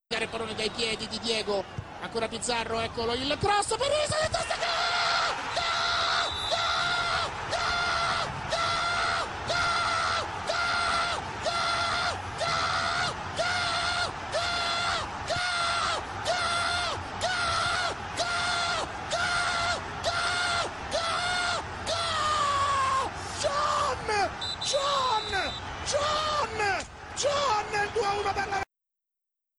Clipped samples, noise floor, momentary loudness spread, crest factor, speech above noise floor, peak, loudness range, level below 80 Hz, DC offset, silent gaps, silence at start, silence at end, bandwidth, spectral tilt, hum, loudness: under 0.1%; -87 dBFS; 5 LU; 16 dB; 58 dB; -14 dBFS; 2 LU; -50 dBFS; under 0.1%; none; 0.1 s; 0.95 s; 12 kHz; -2 dB/octave; none; -28 LUFS